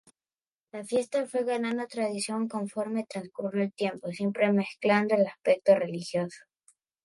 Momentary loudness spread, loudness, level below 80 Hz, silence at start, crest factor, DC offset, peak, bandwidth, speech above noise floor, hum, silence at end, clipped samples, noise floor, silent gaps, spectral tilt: 9 LU; -29 LUFS; -78 dBFS; 0.75 s; 20 dB; under 0.1%; -10 dBFS; 11.5 kHz; over 62 dB; none; 0.65 s; under 0.1%; under -90 dBFS; none; -5.5 dB/octave